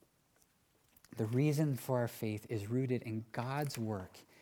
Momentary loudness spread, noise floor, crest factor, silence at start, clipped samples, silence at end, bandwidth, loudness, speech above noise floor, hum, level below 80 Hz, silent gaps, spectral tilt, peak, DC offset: 9 LU; -73 dBFS; 16 dB; 1.15 s; under 0.1%; 0.2 s; 19.5 kHz; -37 LUFS; 37 dB; none; -76 dBFS; none; -7 dB/octave; -22 dBFS; under 0.1%